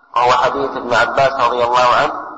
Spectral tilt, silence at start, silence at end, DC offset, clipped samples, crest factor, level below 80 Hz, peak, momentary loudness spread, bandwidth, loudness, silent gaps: -3.5 dB/octave; 0.15 s; 0 s; under 0.1%; under 0.1%; 10 dB; -48 dBFS; -4 dBFS; 5 LU; 8.6 kHz; -14 LUFS; none